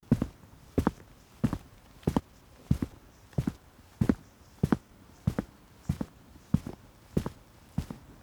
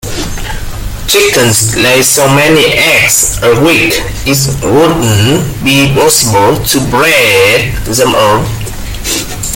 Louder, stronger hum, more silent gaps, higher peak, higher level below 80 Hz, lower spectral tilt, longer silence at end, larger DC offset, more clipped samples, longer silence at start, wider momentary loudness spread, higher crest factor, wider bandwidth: second, -34 LUFS vs -7 LUFS; neither; neither; second, -10 dBFS vs 0 dBFS; second, -46 dBFS vs -24 dBFS; first, -8 dB/octave vs -3.5 dB/octave; about the same, 0.1 s vs 0 s; neither; second, under 0.1% vs 0.6%; about the same, 0.1 s vs 0.05 s; about the same, 14 LU vs 12 LU; first, 24 dB vs 8 dB; about the same, over 20 kHz vs over 20 kHz